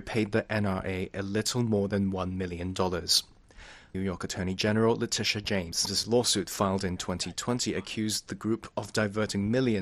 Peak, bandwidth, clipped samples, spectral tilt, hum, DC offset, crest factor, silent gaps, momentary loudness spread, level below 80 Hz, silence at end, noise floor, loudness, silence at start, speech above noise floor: -10 dBFS; 13.5 kHz; under 0.1%; -4 dB/octave; none; under 0.1%; 20 dB; none; 8 LU; -54 dBFS; 0 s; -51 dBFS; -29 LUFS; 0 s; 22 dB